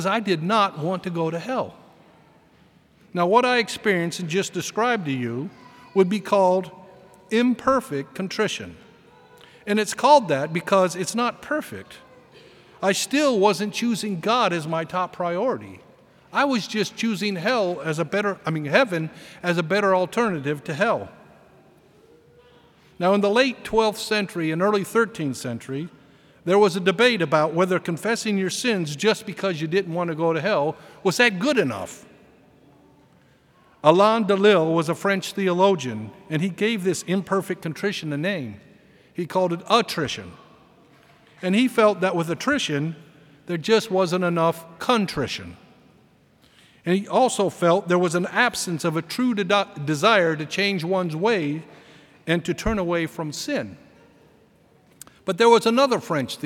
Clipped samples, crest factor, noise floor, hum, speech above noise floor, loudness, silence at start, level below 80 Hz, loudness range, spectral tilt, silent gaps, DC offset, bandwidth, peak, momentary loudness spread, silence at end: under 0.1%; 22 dB; -57 dBFS; none; 35 dB; -22 LUFS; 0 s; -56 dBFS; 4 LU; -5 dB/octave; none; under 0.1%; 17.5 kHz; 0 dBFS; 12 LU; 0 s